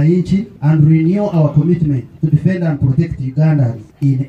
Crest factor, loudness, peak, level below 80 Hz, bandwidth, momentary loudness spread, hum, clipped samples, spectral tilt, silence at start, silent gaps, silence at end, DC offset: 12 dB; -14 LUFS; -2 dBFS; -40 dBFS; 5.2 kHz; 7 LU; none; under 0.1%; -10.5 dB/octave; 0 s; none; 0 s; under 0.1%